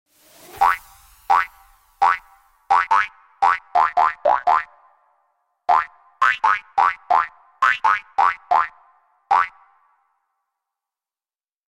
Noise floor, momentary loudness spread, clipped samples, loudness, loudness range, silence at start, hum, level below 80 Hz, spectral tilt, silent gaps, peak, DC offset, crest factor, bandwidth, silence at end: under -90 dBFS; 10 LU; under 0.1%; -19 LUFS; 3 LU; 0.55 s; none; -58 dBFS; -1.5 dB/octave; none; -4 dBFS; under 0.1%; 18 dB; 16.5 kHz; 2.2 s